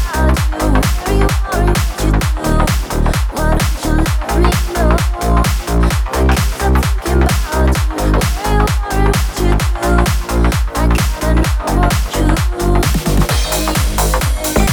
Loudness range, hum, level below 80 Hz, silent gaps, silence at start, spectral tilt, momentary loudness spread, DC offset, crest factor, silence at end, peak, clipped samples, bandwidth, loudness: 1 LU; none; -16 dBFS; none; 0 s; -5 dB/octave; 2 LU; under 0.1%; 12 dB; 0 s; 0 dBFS; under 0.1%; over 20 kHz; -15 LUFS